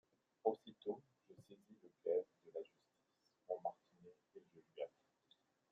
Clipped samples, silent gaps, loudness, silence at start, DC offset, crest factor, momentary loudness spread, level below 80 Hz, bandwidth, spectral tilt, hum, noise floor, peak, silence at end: under 0.1%; none; -47 LUFS; 0.45 s; under 0.1%; 26 dB; 25 LU; under -90 dBFS; 7 kHz; -5 dB/octave; none; -83 dBFS; -22 dBFS; 0.85 s